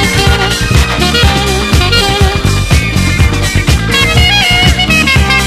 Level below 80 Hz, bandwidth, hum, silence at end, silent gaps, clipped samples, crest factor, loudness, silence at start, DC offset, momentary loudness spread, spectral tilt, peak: -16 dBFS; 14.5 kHz; none; 0 s; none; 0.7%; 8 dB; -8 LUFS; 0 s; under 0.1%; 4 LU; -4 dB/octave; 0 dBFS